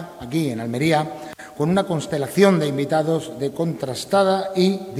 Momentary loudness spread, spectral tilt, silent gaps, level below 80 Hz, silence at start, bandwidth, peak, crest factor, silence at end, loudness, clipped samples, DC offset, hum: 10 LU; -6 dB/octave; none; -58 dBFS; 0 s; 16 kHz; -2 dBFS; 20 dB; 0 s; -21 LUFS; under 0.1%; under 0.1%; none